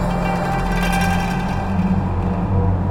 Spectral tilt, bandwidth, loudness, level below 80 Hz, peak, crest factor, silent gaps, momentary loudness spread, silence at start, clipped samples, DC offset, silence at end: -7 dB/octave; 16.5 kHz; -20 LUFS; -26 dBFS; -6 dBFS; 12 dB; none; 3 LU; 0 s; under 0.1%; under 0.1%; 0 s